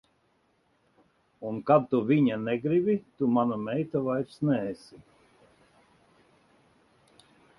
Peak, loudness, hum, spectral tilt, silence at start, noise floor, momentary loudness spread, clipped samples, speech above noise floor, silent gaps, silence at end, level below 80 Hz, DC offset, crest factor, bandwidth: -8 dBFS; -27 LUFS; none; -9 dB/octave; 1.4 s; -70 dBFS; 12 LU; under 0.1%; 43 dB; none; 2.65 s; -68 dBFS; under 0.1%; 22 dB; 11.5 kHz